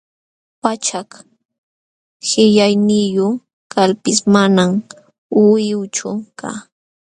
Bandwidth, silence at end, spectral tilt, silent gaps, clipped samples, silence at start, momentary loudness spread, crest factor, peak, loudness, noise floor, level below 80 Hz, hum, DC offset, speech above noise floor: 10.5 kHz; 0.4 s; -4.5 dB/octave; 1.45-1.49 s, 1.58-2.20 s, 3.53-3.70 s, 5.18-5.29 s; under 0.1%; 0.65 s; 14 LU; 16 dB; 0 dBFS; -15 LUFS; under -90 dBFS; -60 dBFS; none; under 0.1%; over 76 dB